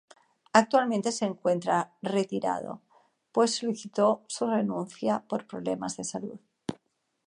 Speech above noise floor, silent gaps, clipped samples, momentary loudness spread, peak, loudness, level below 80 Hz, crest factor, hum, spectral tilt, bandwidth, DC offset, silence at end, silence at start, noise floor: 46 dB; none; under 0.1%; 15 LU; -4 dBFS; -28 LUFS; -74 dBFS; 24 dB; none; -4.5 dB/octave; 11 kHz; under 0.1%; 0.55 s; 0.55 s; -74 dBFS